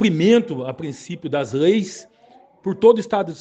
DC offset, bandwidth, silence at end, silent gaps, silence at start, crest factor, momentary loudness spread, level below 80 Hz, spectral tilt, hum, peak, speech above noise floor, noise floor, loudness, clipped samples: under 0.1%; 8.4 kHz; 0.05 s; none; 0 s; 18 dB; 16 LU; -64 dBFS; -6 dB/octave; none; 0 dBFS; 33 dB; -51 dBFS; -19 LUFS; under 0.1%